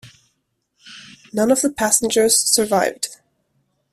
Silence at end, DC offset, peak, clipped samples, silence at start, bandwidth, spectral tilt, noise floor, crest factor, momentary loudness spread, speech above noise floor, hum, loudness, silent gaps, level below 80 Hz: 0.8 s; under 0.1%; 0 dBFS; under 0.1%; 0.05 s; 15.5 kHz; -2 dB/octave; -71 dBFS; 20 dB; 21 LU; 53 dB; none; -17 LUFS; none; -56 dBFS